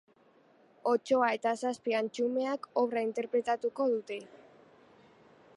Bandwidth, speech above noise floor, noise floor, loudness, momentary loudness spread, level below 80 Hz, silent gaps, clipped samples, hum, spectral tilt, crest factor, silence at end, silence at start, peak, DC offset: 11.5 kHz; 33 dB; -64 dBFS; -32 LUFS; 6 LU; -84 dBFS; none; under 0.1%; none; -4.5 dB/octave; 18 dB; 1.2 s; 0.85 s; -14 dBFS; under 0.1%